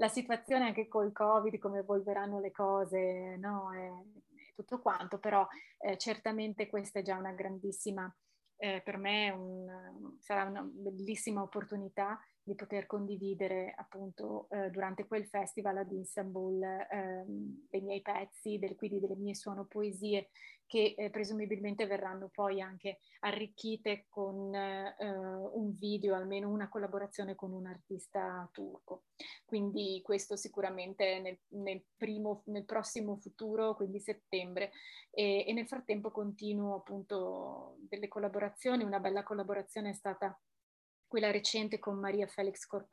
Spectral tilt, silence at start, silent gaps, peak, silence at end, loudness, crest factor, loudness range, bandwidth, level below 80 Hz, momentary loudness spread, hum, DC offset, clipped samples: -4.5 dB/octave; 0 s; 40.63-41.03 s; -16 dBFS; 0.1 s; -38 LUFS; 22 dB; 3 LU; 12.5 kHz; -86 dBFS; 11 LU; none; under 0.1%; under 0.1%